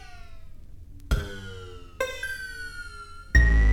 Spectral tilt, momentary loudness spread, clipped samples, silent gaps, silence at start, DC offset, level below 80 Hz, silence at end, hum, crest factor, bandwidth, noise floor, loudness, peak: -5.5 dB/octave; 26 LU; under 0.1%; none; 0.1 s; under 0.1%; -28 dBFS; 0 s; none; 20 dB; 16 kHz; -42 dBFS; -27 LUFS; -6 dBFS